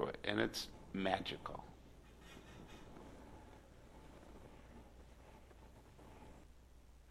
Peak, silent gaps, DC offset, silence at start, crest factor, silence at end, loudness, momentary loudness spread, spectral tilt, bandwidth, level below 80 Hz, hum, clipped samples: -20 dBFS; none; under 0.1%; 0 s; 28 dB; 0 s; -43 LUFS; 23 LU; -4.5 dB/octave; 15.5 kHz; -62 dBFS; none; under 0.1%